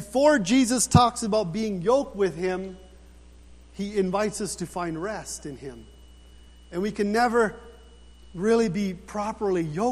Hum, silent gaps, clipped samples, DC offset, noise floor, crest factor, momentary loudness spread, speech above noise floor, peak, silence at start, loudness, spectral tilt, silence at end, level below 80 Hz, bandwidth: none; none; under 0.1%; under 0.1%; -49 dBFS; 22 dB; 16 LU; 25 dB; -4 dBFS; 0 s; -25 LUFS; -5 dB/octave; 0 s; -48 dBFS; 14.5 kHz